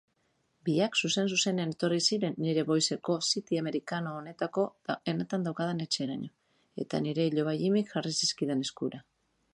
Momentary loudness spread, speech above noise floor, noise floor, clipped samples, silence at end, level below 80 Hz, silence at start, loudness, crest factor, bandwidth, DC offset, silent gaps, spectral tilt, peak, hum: 10 LU; 44 dB; -74 dBFS; under 0.1%; 0.5 s; -76 dBFS; 0.65 s; -30 LUFS; 18 dB; 11.5 kHz; under 0.1%; none; -4 dB/octave; -12 dBFS; none